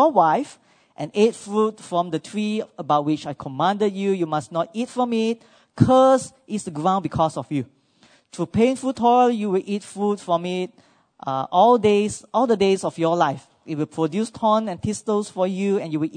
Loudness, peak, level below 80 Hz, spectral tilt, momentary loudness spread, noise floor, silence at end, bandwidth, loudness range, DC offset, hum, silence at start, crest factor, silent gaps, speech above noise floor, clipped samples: -21 LUFS; 0 dBFS; -58 dBFS; -6 dB/octave; 12 LU; -57 dBFS; 0 s; 9.6 kHz; 3 LU; under 0.1%; none; 0 s; 22 dB; none; 36 dB; under 0.1%